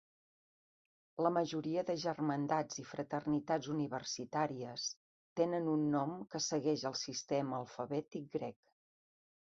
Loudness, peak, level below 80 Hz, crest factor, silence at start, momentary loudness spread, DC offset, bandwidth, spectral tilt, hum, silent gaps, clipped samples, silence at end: -38 LUFS; -18 dBFS; -78 dBFS; 20 dB; 1.15 s; 9 LU; under 0.1%; 7.6 kHz; -5 dB/octave; none; 4.96-5.36 s; under 0.1%; 1.05 s